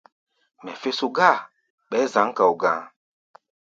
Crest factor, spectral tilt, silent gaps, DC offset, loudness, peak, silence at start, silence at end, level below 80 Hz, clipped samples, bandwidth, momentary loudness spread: 24 dB; -4 dB/octave; 1.70-1.78 s; under 0.1%; -22 LUFS; 0 dBFS; 0.65 s; 0.8 s; -74 dBFS; under 0.1%; 7.8 kHz; 12 LU